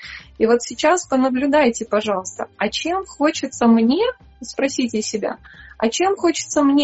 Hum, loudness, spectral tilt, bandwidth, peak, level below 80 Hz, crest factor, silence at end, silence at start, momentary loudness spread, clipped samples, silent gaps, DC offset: none; -19 LUFS; -3.5 dB/octave; 8.2 kHz; -2 dBFS; -52 dBFS; 16 dB; 0 s; 0 s; 9 LU; under 0.1%; none; under 0.1%